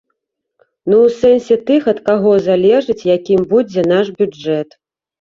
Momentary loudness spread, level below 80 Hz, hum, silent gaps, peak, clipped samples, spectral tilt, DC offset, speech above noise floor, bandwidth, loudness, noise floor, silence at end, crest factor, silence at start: 8 LU; -52 dBFS; none; none; -2 dBFS; under 0.1%; -7 dB/octave; under 0.1%; 60 dB; 7.4 kHz; -13 LUFS; -72 dBFS; 0.6 s; 12 dB; 0.85 s